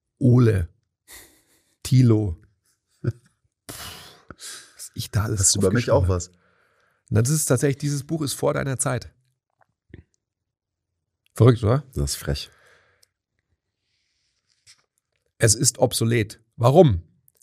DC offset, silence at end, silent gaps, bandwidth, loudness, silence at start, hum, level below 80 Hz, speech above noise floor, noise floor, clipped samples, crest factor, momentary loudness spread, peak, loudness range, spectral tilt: under 0.1%; 0.4 s; none; 15.5 kHz; -21 LUFS; 0.2 s; none; -44 dBFS; 64 dB; -83 dBFS; under 0.1%; 22 dB; 20 LU; -2 dBFS; 8 LU; -5 dB/octave